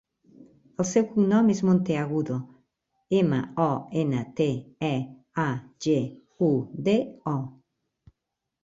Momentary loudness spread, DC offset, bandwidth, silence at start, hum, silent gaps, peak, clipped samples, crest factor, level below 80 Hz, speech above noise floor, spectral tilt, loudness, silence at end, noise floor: 10 LU; under 0.1%; 7.8 kHz; 0.4 s; none; none; -10 dBFS; under 0.1%; 16 dB; -64 dBFS; 59 dB; -7 dB/octave; -26 LUFS; 1.15 s; -84 dBFS